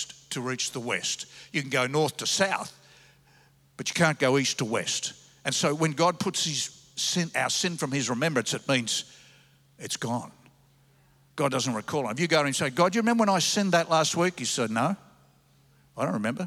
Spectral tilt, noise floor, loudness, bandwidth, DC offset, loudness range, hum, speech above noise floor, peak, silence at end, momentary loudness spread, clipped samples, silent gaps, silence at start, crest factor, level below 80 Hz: -3.5 dB/octave; -61 dBFS; -26 LUFS; 16 kHz; under 0.1%; 6 LU; none; 34 dB; -10 dBFS; 0 s; 11 LU; under 0.1%; none; 0 s; 20 dB; -72 dBFS